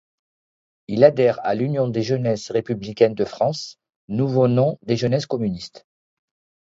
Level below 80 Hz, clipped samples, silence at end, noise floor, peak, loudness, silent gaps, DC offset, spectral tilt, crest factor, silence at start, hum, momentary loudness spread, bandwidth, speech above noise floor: -58 dBFS; under 0.1%; 0.85 s; under -90 dBFS; 0 dBFS; -21 LUFS; 3.96-4.08 s; under 0.1%; -7 dB/octave; 20 dB; 0.9 s; none; 12 LU; 7.8 kHz; over 70 dB